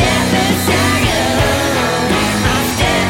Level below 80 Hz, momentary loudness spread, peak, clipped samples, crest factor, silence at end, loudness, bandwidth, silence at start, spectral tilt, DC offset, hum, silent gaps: -28 dBFS; 2 LU; -2 dBFS; under 0.1%; 12 dB; 0 s; -13 LUFS; 17 kHz; 0 s; -4 dB/octave; under 0.1%; none; none